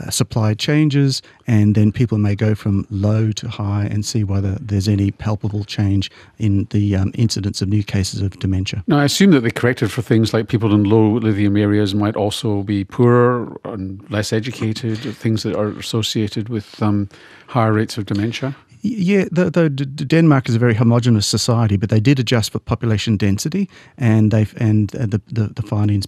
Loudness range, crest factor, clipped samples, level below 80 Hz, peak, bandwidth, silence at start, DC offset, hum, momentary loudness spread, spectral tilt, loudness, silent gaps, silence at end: 5 LU; 14 dB; under 0.1%; -50 dBFS; -2 dBFS; 14.5 kHz; 0 s; under 0.1%; none; 9 LU; -6 dB/octave; -18 LUFS; none; 0 s